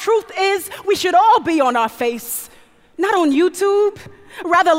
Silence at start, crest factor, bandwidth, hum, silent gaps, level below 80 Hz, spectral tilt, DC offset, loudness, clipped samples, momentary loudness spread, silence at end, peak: 0 s; 16 dB; 16 kHz; none; none; -58 dBFS; -3 dB/octave; under 0.1%; -17 LUFS; under 0.1%; 12 LU; 0 s; -2 dBFS